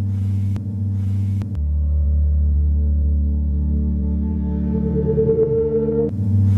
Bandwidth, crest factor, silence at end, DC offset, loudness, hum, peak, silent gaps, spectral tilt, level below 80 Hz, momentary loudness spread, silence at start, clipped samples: 1.9 kHz; 12 dB; 0 s; under 0.1%; -20 LUFS; none; -6 dBFS; none; -12 dB/octave; -22 dBFS; 5 LU; 0 s; under 0.1%